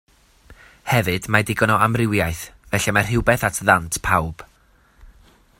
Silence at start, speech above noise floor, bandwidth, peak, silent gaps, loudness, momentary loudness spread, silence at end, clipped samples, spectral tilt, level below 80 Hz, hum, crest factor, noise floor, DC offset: 0.5 s; 37 dB; 16.5 kHz; 0 dBFS; none; -19 LUFS; 10 LU; 0.55 s; under 0.1%; -4.5 dB/octave; -42 dBFS; none; 22 dB; -56 dBFS; under 0.1%